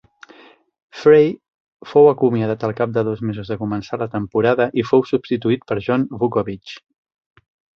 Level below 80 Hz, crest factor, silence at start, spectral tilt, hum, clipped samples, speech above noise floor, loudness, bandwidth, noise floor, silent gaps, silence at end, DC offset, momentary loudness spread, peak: -54 dBFS; 18 dB; 0.95 s; -8 dB/octave; none; under 0.1%; 30 dB; -18 LUFS; 6.6 kHz; -47 dBFS; 1.54-1.77 s; 1 s; under 0.1%; 12 LU; -2 dBFS